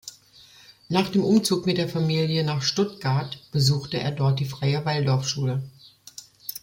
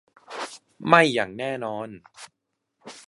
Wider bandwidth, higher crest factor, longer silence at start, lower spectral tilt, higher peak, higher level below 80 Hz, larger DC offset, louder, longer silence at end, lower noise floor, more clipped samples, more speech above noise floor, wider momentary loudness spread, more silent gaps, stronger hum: first, 16.5 kHz vs 11.5 kHz; second, 18 dB vs 24 dB; second, 0.05 s vs 0.3 s; about the same, -5.5 dB/octave vs -4.5 dB/octave; second, -6 dBFS vs -2 dBFS; first, -58 dBFS vs -70 dBFS; neither; about the same, -24 LUFS vs -22 LUFS; about the same, 0.05 s vs 0.1 s; second, -52 dBFS vs -72 dBFS; neither; second, 29 dB vs 49 dB; second, 15 LU vs 23 LU; neither; neither